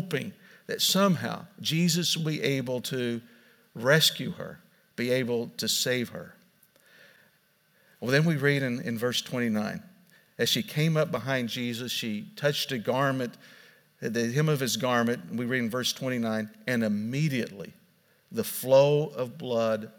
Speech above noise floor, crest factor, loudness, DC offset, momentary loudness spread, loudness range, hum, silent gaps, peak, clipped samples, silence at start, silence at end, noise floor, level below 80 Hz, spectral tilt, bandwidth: 39 dB; 20 dB; -27 LUFS; under 0.1%; 14 LU; 3 LU; none; none; -8 dBFS; under 0.1%; 0 s; 0.1 s; -66 dBFS; -76 dBFS; -4.5 dB/octave; 18 kHz